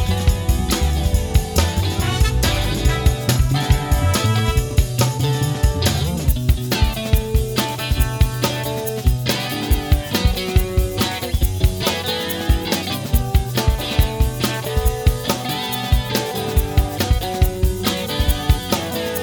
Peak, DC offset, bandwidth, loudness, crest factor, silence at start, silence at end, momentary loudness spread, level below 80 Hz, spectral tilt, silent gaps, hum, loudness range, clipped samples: 0 dBFS; under 0.1%; over 20 kHz; -19 LUFS; 18 dB; 0 s; 0 s; 3 LU; -22 dBFS; -5 dB/octave; none; none; 2 LU; under 0.1%